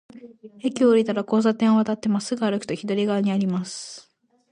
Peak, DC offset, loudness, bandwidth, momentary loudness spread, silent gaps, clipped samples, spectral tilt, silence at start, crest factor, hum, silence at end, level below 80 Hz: -8 dBFS; under 0.1%; -22 LUFS; 10.5 kHz; 12 LU; none; under 0.1%; -6 dB/octave; 0.15 s; 16 dB; none; 0.5 s; -68 dBFS